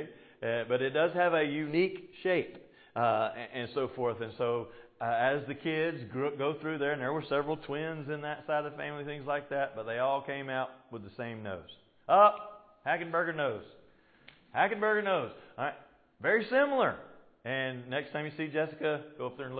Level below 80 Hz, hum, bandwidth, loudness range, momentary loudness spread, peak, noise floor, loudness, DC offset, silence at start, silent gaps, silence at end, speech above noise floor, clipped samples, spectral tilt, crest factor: -72 dBFS; none; 4.8 kHz; 4 LU; 14 LU; -10 dBFS; -62 dBFS; -32 LUFS; under 0.1%; 0 s; none; 0 s; 30 dB; under 0.1%; -3.5 dB/octave; 22 dB